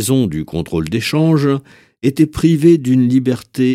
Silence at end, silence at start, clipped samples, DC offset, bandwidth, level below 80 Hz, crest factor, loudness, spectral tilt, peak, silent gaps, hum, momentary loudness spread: 0 s; 0 s; under 0.1%; under 0.1%; 16 kHz; -40 dBFS; 14 dB; -15 LUFS; -6.5 dB/octave; 0 dBFS; none; none; 9 LU